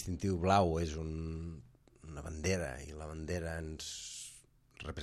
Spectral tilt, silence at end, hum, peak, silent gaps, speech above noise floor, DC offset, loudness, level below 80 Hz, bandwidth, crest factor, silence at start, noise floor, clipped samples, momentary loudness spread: -5.5 dB/octave; 0 s; none; -14 dBFS; none; 25 dB; under 0.1%; -37 LUFS; -52 dBFS; 13 kHz; 22 dB; 0 s; -61 dBFS; under 0.1%; 19 LU